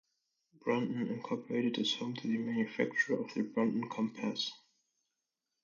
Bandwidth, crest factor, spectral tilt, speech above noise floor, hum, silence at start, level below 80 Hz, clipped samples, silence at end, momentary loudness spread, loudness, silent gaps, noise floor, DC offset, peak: 7.4 kHz; 18 dB; -5 dB/octave; 53 dB; none; 0.65 s; -82 dBFS; under 0.1%; 1.05 s; 5 LU; -35 LUFS; none; -88 dBFS; under 0.1%; -18 dBFS